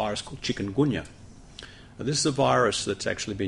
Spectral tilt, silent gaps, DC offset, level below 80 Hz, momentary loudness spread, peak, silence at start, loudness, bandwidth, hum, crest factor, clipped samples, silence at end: -4 dB/octave; none; under 0.1%; -52 dBFS; 22 LU; -8 dBFS; 0 s; -26 LUFS; 11.5 kHz; none; 18 dB; under 0.1%; 0 s